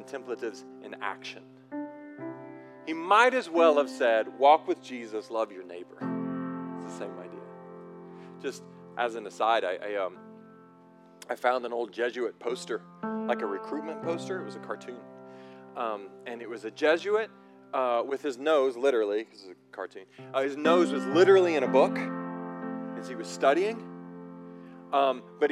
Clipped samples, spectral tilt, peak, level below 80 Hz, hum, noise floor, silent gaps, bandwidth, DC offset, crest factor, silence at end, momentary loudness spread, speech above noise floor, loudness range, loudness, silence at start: under 0.1%; -5 dB/octave; -8 dBFS; under -90 dBFS; none; -55 dBFS; none; 12 kHz; under 0.1%; 22 dB; 0 s; 22 LU; 27 dB; 11 LU; -28 LUFS; 0 s